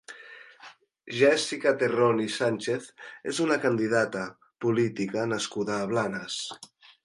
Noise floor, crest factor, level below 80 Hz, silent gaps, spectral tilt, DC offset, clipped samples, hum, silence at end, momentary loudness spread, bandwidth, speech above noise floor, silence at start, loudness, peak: -52 dBFS; 20 dB; -70 dBFS; none; -4.5 dB/octave; under 0.1%; under 0.1%; none; 0.4 s; 15 LU; 11.5 kHz; 26 dB; 0.1 s; -27 LUFS; -8 dBFS